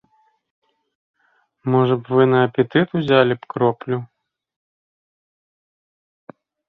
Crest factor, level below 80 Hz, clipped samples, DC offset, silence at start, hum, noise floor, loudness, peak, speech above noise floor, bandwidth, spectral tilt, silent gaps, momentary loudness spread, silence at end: 20 dB; -62 dBFS; under 0.1%; under 0.1%; 1.65 s; none; -63 dBFS; -18 LUFS; -2 dBFS; 45 dB; 4.5 kHz; -9.5 dB/octave; none; 10 LU; 2.65 s